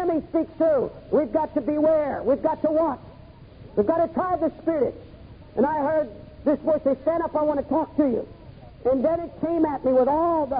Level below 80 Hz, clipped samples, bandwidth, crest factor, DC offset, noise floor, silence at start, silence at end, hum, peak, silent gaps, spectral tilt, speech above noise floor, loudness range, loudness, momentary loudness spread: -50 dBFS; under 0.1%; 5 kHz; 14 dB; under 0.1%; -46 dBFS; 0 s; 0 s; none; -10 dBFS; none; -12 dB/octave; 23 dB; 2 LU; -24 LUFS; 7 LU